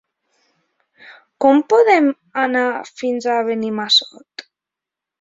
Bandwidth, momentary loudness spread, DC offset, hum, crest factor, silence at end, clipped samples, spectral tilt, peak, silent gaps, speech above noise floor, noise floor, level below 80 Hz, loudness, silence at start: 7.8 kHz; 19 LU; under 0.1%; none; 16 dB; 0.8 s; under 0.1%; -3.5 dB/octave; -2 dBFS; none; 70 dB; -86 dBFS; -68 dBFS; -16 LUFS; 1.1 s